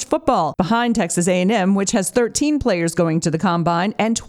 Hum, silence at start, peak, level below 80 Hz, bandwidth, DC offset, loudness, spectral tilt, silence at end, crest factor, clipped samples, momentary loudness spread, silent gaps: none; 0 s; -2 dBFS; -44 dBFS; 14.5 kHz; under 0.1%; -18 LUFS; -5 dB/octave; 0 s; 16 dB; under 0.1%; 2 LU; none